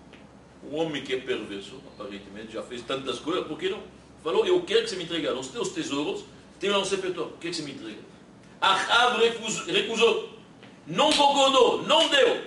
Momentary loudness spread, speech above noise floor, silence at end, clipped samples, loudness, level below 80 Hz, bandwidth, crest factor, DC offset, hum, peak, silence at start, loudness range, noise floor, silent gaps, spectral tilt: 19 LU; 24 dB; 0 s; under 0.1%; -25 LUFS; -62 dBFS; 11.5 kHz; 20 dB; under 0.1%; none; -6 dBFS; 0.15 s; 10 LU; -50 dBFS; none; -2.5 dB/octave